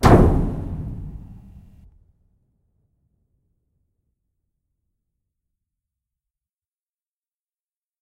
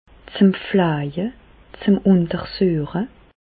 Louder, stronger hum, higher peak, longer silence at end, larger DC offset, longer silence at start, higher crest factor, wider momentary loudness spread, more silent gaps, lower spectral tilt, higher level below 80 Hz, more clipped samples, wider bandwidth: about the same, -20 LUFS vs -20 LUFS; neither; first, 0 dBFS vs -4 dBFS; first, 6.7 s vs 0.35 s; neither; second, 0 s vs 0.3 s; first, 24 dB vs 16 dB; first, 26 LU vs 12 LU; neither; second, -7.5 dB/octave vs -12 dB/octave; first, -32 dBFS vs -48 dBFS; neither; first, 15.5 kHz vs 4.8 kHz